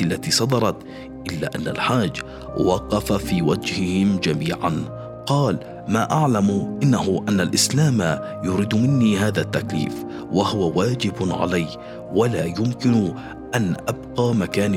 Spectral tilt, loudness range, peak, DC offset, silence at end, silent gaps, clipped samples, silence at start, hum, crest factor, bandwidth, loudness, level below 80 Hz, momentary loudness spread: -5.5 dB/octave; 3 LU; -4 dBFS; under 0.1%; 0 s; none; under 0.1%; 0 s; none; 16 dB; 16.5 kHz; -21 LUFS; -46 dBFS; 10 LU